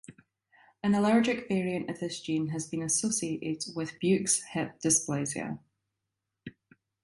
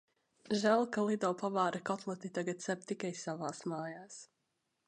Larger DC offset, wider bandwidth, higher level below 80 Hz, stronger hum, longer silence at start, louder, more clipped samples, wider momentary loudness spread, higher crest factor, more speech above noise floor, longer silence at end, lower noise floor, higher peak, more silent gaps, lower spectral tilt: neither; about the same, 11.5 kHz vs 10.5 kHz; first, -68 dBFS vs -82 dBFS; neither; second, 0.1 s vs 0.45 s; first, -29 LUFS vs -36 LUFS; neither; about the same, 13 LU vs 12 LU; about the same, 20 dB vs 20 dB; first, 56 dB vs 47 dB; about the same, 0.55 s vs 0.65 s; about the same, -86 dBFS vs -83 dBFS; first, -12 dBFS vs -16 dBFS; neither; about the same, -4 dB/octave vs -5 dB/octave